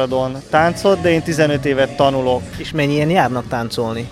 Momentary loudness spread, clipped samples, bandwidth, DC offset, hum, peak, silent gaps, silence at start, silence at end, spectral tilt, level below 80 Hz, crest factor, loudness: 7 LU; under 0.1%; 15.5 kHz; under 0.1%; none; 0 dBFS; none; 0 s; 0 s; -6 dB/octave; -42 dBFS; 16 dB; -17 LUFS